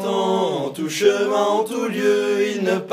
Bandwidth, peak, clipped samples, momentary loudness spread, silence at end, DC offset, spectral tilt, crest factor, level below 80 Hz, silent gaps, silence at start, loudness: 15.5 kHz; -4 dBFS; under 0.1%; 5 LU; 0 s; under 0.1%; -4.5 dB/octave; 16 dB; -78 dBFS; none; 0 s; -20 LUFS